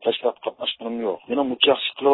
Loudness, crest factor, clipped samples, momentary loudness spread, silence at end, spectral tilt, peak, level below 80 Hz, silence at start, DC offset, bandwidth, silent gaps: -23 LUFS; 20 dB; under 0.1%; 9 LU; 0 s; -8 dB/octave; -2 dBFS; -68 dBFS; 0 s; under 0.1%; 4.1 kHz; none